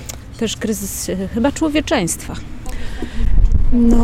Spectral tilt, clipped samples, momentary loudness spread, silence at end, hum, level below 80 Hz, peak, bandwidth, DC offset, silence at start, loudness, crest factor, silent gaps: -5 dB/octave; under 0.1%; 14 LU; 0 s; none; -18 dBFS; 0 dBFS; 15.5 kHz; under 0.1%; 0 s; -19 LUFS; 14 dB; none